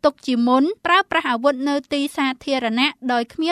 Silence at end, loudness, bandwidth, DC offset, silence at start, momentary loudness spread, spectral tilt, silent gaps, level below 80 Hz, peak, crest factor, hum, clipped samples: 0 s; -20 LUFS; 13.5 kHz; under 0.1%; 0.05 s; 6 LU; -3.5 dB/octave; none; -60 dBFS; -2 dBFS; 18 dB; none; under 0.1%